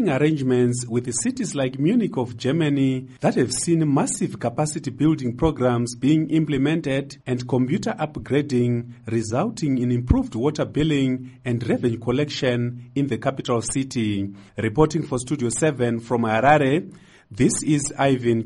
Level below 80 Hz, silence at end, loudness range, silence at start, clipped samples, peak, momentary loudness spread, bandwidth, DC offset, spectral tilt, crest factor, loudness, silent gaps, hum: -42 dBFS; 0 s; 2 LU; 0 s; under 0.1%; -2 dBFS; 6 LU; 11.5 kHz; under 0.1%; -5.5 dB/octave; 20 dB; -22 LUFS; none; none